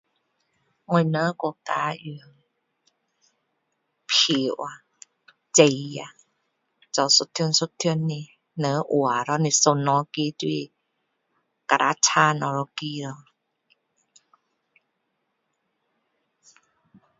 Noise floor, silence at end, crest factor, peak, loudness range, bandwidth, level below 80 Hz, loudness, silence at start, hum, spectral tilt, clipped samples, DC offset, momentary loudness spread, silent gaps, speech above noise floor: -76 dBFS; 4.05 s; 26 dB; 0 dBFS; 6 LU; 8 kHz; -74 dBFS; -22 LUFS; 0.9 s; none; -3 dB/octave; under 0.1%; under 0.1%; 18 LU; none; 53 dB